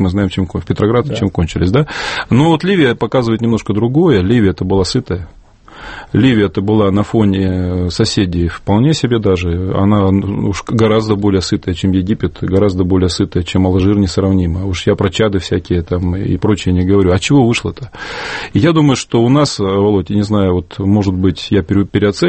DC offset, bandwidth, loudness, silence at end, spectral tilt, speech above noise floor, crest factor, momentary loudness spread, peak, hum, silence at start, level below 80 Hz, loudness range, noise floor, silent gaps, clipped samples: under 0.1%; 8.8 kHz; -13 LUFS; 0 s; -6.5 dB/octave; 22 dB; 12 dB; 6 LU; 0 dBFS; none; 0 s; -34 dBFS; 2 LU; -35 dBFS; none; under 0.1%